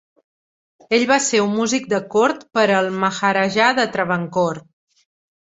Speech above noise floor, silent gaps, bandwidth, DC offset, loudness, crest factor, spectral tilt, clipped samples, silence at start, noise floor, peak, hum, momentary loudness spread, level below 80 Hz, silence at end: over 72 dB; none; 8.2 kHz; under 0.1%; -18 LUFS; 18 dB; -3.5 dB/octave; under 0.1%; 0.9 s; under -90 dBFS; -2 dBFS; none; 5 LU; -62 dBFS; 0.9 s